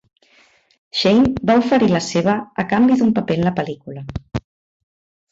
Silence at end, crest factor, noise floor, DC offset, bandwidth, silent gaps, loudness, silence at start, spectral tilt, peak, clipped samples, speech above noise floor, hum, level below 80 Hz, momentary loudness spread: 0.9 s; 16 dB; -55 dBFS; under 0.1%; 8 kHz; none; -17 LUFS; 0.95 s; -6 dB/octave; -4 dBFS; under 0.1%; 38 dB; none; -44 dBFS; 16 LU